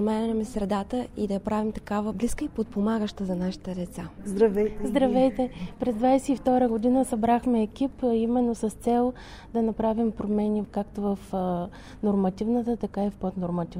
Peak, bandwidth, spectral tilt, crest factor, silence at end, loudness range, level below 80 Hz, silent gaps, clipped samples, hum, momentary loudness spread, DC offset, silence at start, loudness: -10 dBFS; 15 kHz; -7 dB/octave; 16 dB; 0 s; 4 LU; -46 dBFS; none; under 0.1%; none; 8 LU; under 0.1%; 0 s; -27 LUFS